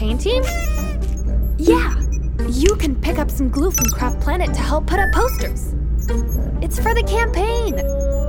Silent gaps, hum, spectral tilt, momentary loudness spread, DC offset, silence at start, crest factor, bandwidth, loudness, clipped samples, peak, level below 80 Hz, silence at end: none; none; -5 dB/octave; 6 LU; under 0.1%; 0 s; 18 dB; 19 kHz; -19 LUFS; under 0.1%; 0 dBFS; -20 dBFS; 0 s